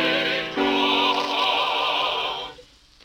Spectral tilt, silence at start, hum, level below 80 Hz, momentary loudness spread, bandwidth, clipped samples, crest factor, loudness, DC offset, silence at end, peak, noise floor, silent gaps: -3 dB/octave; 0 s; none; -58 dBFS; 8 LU; 19.5 kHz; under 0.1%; 14 dB; -21 LUFS; under 0.1%; 0.45 s; -10 dBFS; -50 dBFS; none